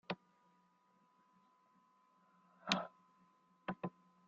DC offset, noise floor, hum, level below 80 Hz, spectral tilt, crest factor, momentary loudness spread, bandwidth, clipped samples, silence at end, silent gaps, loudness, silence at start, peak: under 0.1%; -75 dBFS; none; -84 dBFS; -2.5 dB/octave; 34 dB; 13 LU; 7.2 kHz; under 0.1%; 0.4 s; none; -44 LUFS; 0.1 s; -16 dBFS